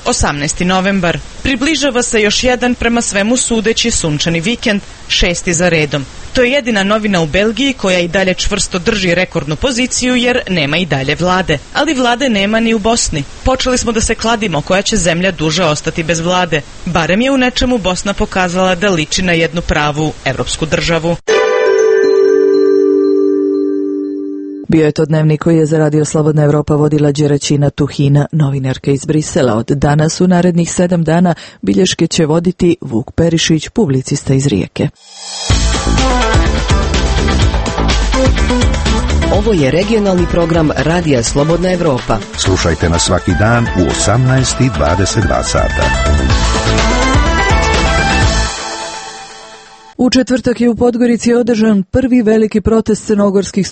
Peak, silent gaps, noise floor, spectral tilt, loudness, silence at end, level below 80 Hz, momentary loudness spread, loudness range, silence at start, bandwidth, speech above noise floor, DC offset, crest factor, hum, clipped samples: 0 dBFS; none; -36 dBFS; -4.5 dB/octave; -12 LUFS; 0 s; -22 dBFS; 5 LU; 2 LU; 0 s; 8.8 kHz; 24 dB; under 0.1%; 12 dB; none; under 0.1%